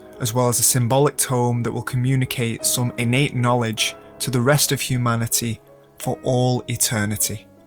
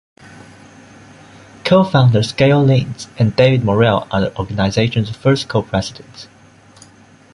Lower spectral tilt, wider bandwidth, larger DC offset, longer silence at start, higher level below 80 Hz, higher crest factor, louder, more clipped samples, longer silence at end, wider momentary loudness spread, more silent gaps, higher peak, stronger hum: second, -4 dB/octave vs -6.5 dB/octave; first, over 20 kHz vs 11 kHz; neither; second, 0 s vs 0.35 s; second, -50 dBFS vs -42 dBFS; about the same, 18 dB vs 16 dB; second, -20 LUFS vs -15 LUFS; neither; second, 0.25 s vs 1.1 s; about the same, 8 LU vs 10 LU; neither; second, -4 dBFS vs 0 dBFS; neither